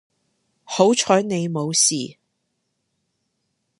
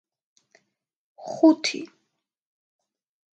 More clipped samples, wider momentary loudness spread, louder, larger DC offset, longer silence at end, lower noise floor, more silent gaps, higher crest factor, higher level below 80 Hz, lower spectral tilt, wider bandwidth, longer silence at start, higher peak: neither; second, 12 LU vs 24 LU; about the same, -19 LUFS vs -21 LUFS; neither; first, 1.65 s vs 1.45 s; second, -74 dBFS vs -78 dBFS; neither; about the same, 22 dB vs 22 dB; first, -70 dBFS vs -86 dBFS; about the same, -3.5 dB/octave vs -3 dB/octave; first, 11.5 kHz vs 9 kHz; second, 0.7 s vs 1.2 s; first, -2 dBFS vs -6 dBFS